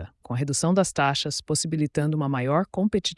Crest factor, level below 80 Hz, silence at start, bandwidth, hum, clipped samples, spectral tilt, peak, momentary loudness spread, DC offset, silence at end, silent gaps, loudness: 16 dB; -54 dBFS; 0 s; 12 kHz; none; under 0.1%; -4.5 dB/octave; -10 dBFS; 5 LU; under 0.1%; 0.05 s; none; -25 LUFS